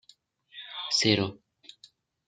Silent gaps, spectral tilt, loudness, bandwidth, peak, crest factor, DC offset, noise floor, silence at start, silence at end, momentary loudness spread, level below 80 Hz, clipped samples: none; -3.5 dB/octave; -26 LUFS; 9.4 kHz; -6 dBFS; 26 dB; under 0.1%; -62 dBFS; 0.55 s; 0.9 s; 22 LU; -70 dBFS; under 0.1%